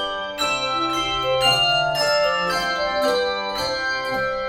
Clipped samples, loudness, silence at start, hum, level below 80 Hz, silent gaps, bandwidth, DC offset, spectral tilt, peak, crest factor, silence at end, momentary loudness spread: under 0.1%; -20 LUFS; 0 s; none; -48 dBFS; none; 17.5 kHz; under 0.1%; -2.5 dB/octave; -6 dBFS; 16 dB; 0 s; 6 LU